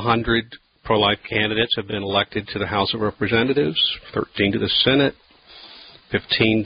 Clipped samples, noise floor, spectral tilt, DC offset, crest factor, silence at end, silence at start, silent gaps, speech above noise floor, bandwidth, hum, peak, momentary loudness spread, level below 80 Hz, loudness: under 0.1%; -45 dBFS; -10 dB/octave; under 0.1%; 18 dB; 0 s; 0 s; none; 25 dB; 5.2 kHz; none; -4 dBFS; 9 LU; -44 dBFS; -20 LUFS